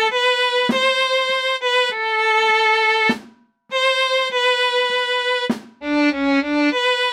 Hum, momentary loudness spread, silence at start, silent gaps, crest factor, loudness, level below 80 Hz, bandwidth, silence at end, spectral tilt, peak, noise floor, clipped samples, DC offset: none; 5 LU; 0 s; none; 12 dB; -17 LUFS; -62 dBFS; 14 kHz; 0 s; -2.5 dB/octave; -6 dBFS; -48 dBFS; under 0.1%; under 0.1%